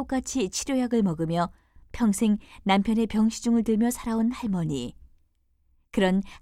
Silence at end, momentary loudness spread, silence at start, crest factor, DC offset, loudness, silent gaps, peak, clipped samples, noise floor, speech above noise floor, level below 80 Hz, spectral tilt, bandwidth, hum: 0.05 s; 7 LU; 0 s; 16 dB; under 0.1%; -26 LUFS; none; -10 dBFS; under 0.1%; -66 dBFS; 42 dB; -48 dBFS; -5.5 dB/octave; 14.5 kHz; none